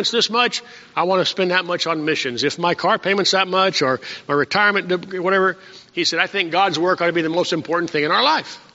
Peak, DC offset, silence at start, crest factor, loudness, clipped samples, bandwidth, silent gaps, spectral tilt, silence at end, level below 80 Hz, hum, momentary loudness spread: -2 dBFS; under 0.1%; 0 s; 18 dB; -18 LUFS; under 0.1%; 8 kHz; none; -1.5 dB/octave; 0.15 s; -66 dBFS; none; 6 LU